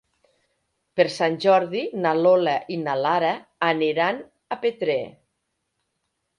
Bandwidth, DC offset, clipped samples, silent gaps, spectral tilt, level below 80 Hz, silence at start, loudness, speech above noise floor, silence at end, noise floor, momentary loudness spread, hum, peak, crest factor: 10.5 kHz; under 0.1%; under 0.1%; none; -5.5 dB/octave; -72 dBFS; 0.95 s; -22 LUFS; 55 dB; 1.3 s; -77 dBFS; 9 LU; none; -4 dBFS; 20 dB